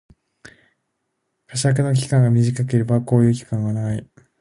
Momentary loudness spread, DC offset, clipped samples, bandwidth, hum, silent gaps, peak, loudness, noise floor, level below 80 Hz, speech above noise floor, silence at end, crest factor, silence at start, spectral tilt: 9 LU; under 0.1%; under 0.1%; 11.5 kHz; none; none; -2 dBFS; -19 LUFS; -74 dBFS; -54 dBFS; 57 dB; 0.35 s; 18 dB; 1.5 s; -7 dB/octave